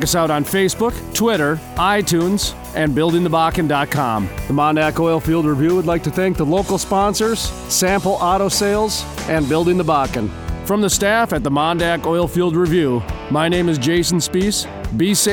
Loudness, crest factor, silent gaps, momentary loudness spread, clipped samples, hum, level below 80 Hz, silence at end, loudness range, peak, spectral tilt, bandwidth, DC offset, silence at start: -17 LUFS; 12 dB; none; 5 LU; under 0.1%; none; -34 dBFS; 0 s; 1 LU; -4 dBFS; -4.5 dB/octave; over 20 kHz; under 0.1%; 0 s